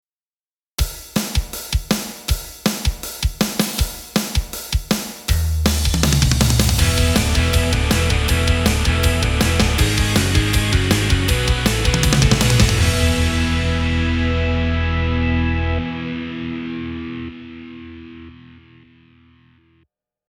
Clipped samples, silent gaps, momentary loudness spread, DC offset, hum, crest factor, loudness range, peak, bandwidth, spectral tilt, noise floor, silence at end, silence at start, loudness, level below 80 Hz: under 0.1%; none; 11 LU; under 0.1%; none; 18 dB; 10 LU; 0 dBFS; 19.5 kHz; -4.5 dB/octave; under -90 dBFS; 1.8 s; 0.8 s; -18 LUFS; -24 dBFS